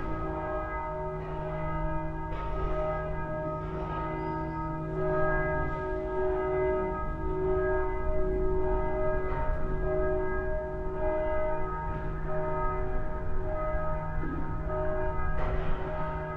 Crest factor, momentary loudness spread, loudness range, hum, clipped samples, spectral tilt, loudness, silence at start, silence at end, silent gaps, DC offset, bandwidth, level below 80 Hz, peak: 14 dB; 6 LU; 4 LU; none; under 0.1%; -9.5 dB/octave; -32 LUFS; 0 s; 0 s; none; under 0.1%; 4.1 kHz; -34 dBFS; -16 dBFS